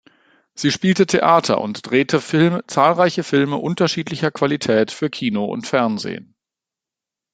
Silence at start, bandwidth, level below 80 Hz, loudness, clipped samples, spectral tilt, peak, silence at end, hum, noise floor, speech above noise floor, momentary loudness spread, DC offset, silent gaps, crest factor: 0.55 s; 9.4 kHz; -60 dBFS; -18 LUFS; under 0.1%; -5.5 dB/octave; -2 dBFS; 1.1 s; none; -87 dBFS; 70 dB; 8 LU; under 0.1%; none; 18 dB